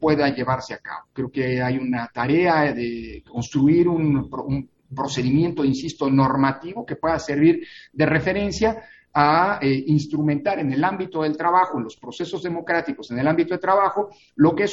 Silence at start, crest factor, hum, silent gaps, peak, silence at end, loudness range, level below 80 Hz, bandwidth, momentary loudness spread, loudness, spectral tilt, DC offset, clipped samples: 0 s; 18 dB; none; none; -2 dBFS; 0 s; 2 LU; -50 dBFS; 7.8 kHz; 12 LU; -21 LUFS; -7 dB/octave; under 0.1%; under 0.1%